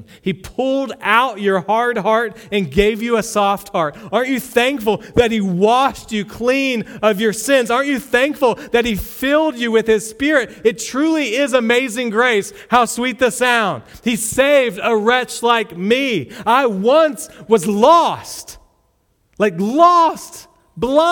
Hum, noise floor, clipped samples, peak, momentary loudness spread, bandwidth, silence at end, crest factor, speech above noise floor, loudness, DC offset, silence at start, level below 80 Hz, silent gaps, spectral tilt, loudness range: none; -61 dBFS; under 0.1%; 0 dBFS; 8 LU; 19 kHz; 0 s; 16 dB; 46 dB; -16 LUFS; under 0.1%; 0.25 s; -44 dBFS; none; -4 dB/octave; 2 LU